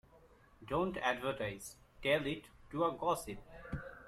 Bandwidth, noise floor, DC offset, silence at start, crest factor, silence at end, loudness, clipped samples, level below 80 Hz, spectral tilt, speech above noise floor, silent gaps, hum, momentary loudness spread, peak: 15.5 kHz; -64 dBFS; under 0.1%; 0.15 s; 20 dB; 0 s; -38 LUFS; under 0.1%; -60 dBFS; -5 dB/octave; 27 dB; none; none; 14 LU; -18 dBFS